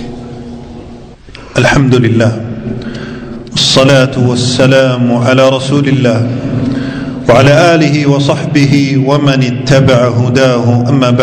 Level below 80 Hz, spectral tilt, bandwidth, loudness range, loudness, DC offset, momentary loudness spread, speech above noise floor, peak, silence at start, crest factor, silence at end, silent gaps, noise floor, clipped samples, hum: -36 dBFS; -6 dB/octave; 10 kHz; 3 LU; -9 LUFS; under 0.1%; 16 LU; 23 dB; 0 dBFS; 0 s; 10 dB; 0 s; none; -31 dBFS; 2%; none